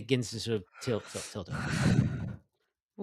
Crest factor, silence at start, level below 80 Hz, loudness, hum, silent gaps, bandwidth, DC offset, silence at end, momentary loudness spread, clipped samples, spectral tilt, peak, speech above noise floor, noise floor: 22 dB; 0 s; -54 dBFS; -33 LUFS; none; 2.85-2.89 s; 13 kHz; under 0.1%; 0 s; 12 LU; under 0.1%; -5.5 dB/octave; -10 dBFS; 50 dB; -82 dBFS